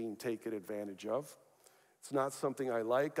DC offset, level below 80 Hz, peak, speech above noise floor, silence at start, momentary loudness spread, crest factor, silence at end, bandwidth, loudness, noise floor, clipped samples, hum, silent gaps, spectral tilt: under 0.1%; under -90 dBFS; -20 dBFS; 30 dB; 0 s; 9 LU; 18 dB; 0 s; 16 kHz; -38 LUFS; -67 dBFS; under 0.1%; none; none; -5.5 dB/octave